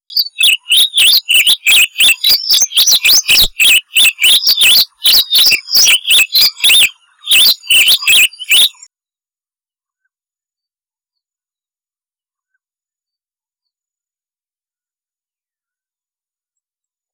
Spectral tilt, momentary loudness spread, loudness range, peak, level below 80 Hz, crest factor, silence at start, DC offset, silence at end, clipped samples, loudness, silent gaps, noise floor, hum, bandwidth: 3.5 dB/octave; 3 LU; 5 LU; -6 dBFS; -42 dBFS; 6 dB; 0.1 s; under 0.1%; 8.45 s; under 0.1%; -7 LUFS; none; under -90 dBFS; none; over 20 kHz